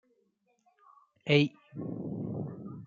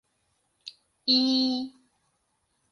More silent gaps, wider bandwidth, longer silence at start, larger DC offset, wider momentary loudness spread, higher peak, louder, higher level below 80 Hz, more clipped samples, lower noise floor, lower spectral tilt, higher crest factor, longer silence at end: neither; second, 7.4 kHz vs 10.5 kHz; first, 1.25 s vs 0.65 s; neither; second, 16 LU vs 24 LU; about the same, -10 dBFS vs -10 dBFS; second, -32 LUFS vs -24 LUFS; about the same, -72 dBFS vs -76 dBFS; neither; about the same, -74 dBFS vs -74 dBFS; first, -7 dB/octave vs -3 dB/octave; first, 26 dB vs 20 dB; second, 0 s vs 1 s